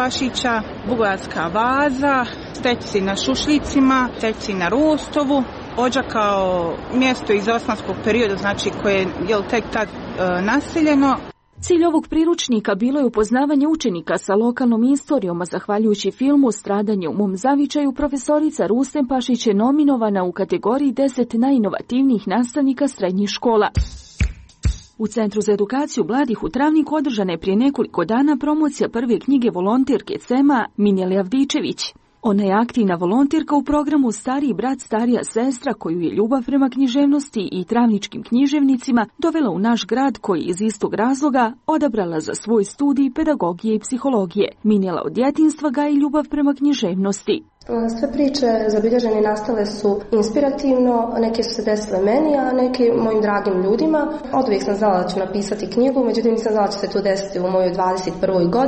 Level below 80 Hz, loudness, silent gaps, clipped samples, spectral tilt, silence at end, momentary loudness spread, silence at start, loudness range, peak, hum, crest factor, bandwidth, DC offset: -40 dBFS; -19 LUFS; none; under 0.1%; -5.5 dB/octave; 0 s; 5 LU; 0 s; 2 LU; -6 dBFS; none; 12 dB; 8.8 kHz; under 0.1%